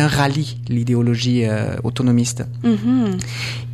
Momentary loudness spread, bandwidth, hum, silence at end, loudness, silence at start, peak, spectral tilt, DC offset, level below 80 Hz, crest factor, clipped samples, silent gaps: 6 LU; 14 kHz; none; 0 s; -19 LUFS; 0 s; -4 dBFS; -6 dB/octave; 0.3%; -46 dBFS; 14 dB; under 0.1%; none